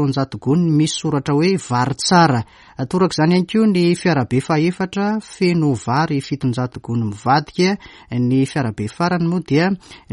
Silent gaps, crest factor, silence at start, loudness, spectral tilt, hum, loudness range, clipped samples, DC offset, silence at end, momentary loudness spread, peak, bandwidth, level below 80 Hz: none; 16 dB; 0 s; -18 LUFS; -6 dB/octave; none; 3 LU; under 0.1%; under 0.1%; 0.15 s; 8 LU; -2 dBFS; 11.5 kHz; -52 dBFS